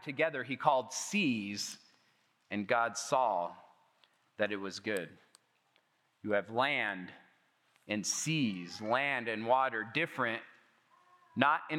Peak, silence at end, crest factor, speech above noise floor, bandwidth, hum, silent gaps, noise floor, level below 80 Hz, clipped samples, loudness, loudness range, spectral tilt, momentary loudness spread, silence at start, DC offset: -8 dBFS; 0 s; 26 dB; 40 dB; 16.5 kHz; none; none; -74 dBFS; under -90 dBFS; under 0.1%; -34 LUFS; 4 LU; -3.5 dB/octave; 11 LU; 0 s; under 0.1%